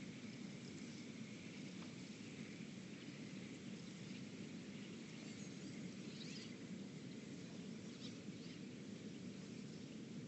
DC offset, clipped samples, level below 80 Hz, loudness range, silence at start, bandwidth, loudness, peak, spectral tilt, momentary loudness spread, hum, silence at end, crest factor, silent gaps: under 0.1%; under 0.1%; -84 dBFS; 1 LU; 0 s; 8.4 kHz; -53 LUFS; -38 dBFS; -5 dB/octave; 1 LU; none; 0 s; 14 dB; none